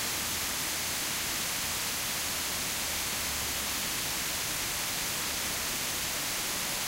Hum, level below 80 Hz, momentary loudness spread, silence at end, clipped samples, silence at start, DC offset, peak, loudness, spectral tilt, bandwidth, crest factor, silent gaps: none; -52 dBFS; 0 LU; 0 s; under 0.1%; 0 s; under 0.1%; -18 dBFS; -30 LUFS; -0.5 dB/octave; 16 kHz; 14 dB; none